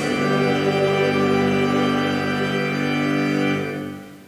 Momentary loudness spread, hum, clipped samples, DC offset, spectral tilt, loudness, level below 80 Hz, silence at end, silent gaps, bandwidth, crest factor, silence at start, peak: 4 LU; 50 Hz at -60 dBFS; under 0.1%; under 0.1%; -6 dB/octave; -20 LUFS; -52 dBFS; 0.05 s; none; 16 kHz; 14 dB; 0 s; -6 dBFS